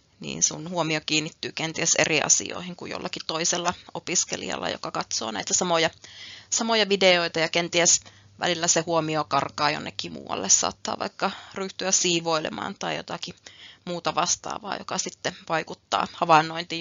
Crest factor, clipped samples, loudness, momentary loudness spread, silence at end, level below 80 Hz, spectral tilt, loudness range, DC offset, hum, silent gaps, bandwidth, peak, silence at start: 24 dB; under 0.1%; -24 LUFS; 14 LU; 0 s; -66 dBFS; -2 dB/octave; 6 LU; under 0.1%; none; none; 7.8 kHz; -2 dBFS; 0.2 s